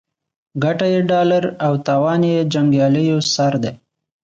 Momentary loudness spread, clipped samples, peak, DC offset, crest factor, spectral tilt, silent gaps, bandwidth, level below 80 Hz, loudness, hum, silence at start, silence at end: 6 LU; under 0.1%; -4 dBFS; under 0.1%; 12 dB; -6 dB/octave; none; 7.8 kHz; -60 dBFS; -17 LUFS; none; 0.55 s; 0.5 s